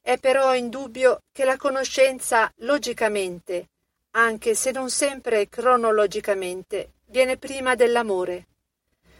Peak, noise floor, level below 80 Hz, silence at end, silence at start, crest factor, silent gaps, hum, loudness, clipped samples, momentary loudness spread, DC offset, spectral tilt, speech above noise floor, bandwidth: -6 dBFS; -75 dBFS; -60 dBFS; 0.8 s; 0.05 s; 16 dB; none; none; -22 LUFS; under 0.1%; 11 LU; under 0.1%; -2 dB/octave; 53 dB; 16.5 kHz